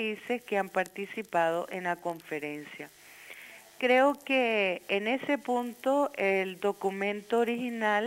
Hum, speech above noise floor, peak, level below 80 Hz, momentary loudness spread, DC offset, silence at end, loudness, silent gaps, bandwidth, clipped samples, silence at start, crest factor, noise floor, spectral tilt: none; 20 dB; -12 dBFS; -80 dBFS; 19 LU; under 0.1%; 0 s; -30 LUFS; none; 16.5 kHz; under 0.1%; 0 s; 18 dB; -49 dBFS; -4.5 dB/octave